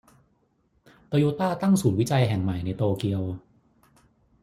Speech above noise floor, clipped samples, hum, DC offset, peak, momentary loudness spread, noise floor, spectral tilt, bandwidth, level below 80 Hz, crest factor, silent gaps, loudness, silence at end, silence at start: 44 dB; under 0.1%; none; under 0.1%; -8 dBFS; 8 LU; -68 dBFS; -7 dB/octave; 15.5 kHz; -58 dBFS; 18 dB; none; -25 LUFS; 1.05 s; 1.1 s